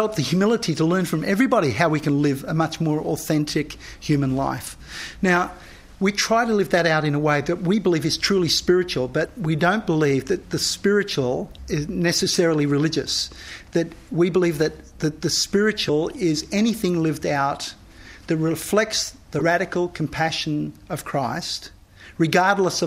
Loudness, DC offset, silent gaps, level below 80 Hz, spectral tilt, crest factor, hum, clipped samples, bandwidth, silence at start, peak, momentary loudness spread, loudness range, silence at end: -22 LUFS; under 0.1%; none; -48 dBFS; -4.5 dB/octave; 18 dB; none; under 0.1%; 16 kHz; 0 s; -2 dBFS; 9 LU; 3 LU; 0 s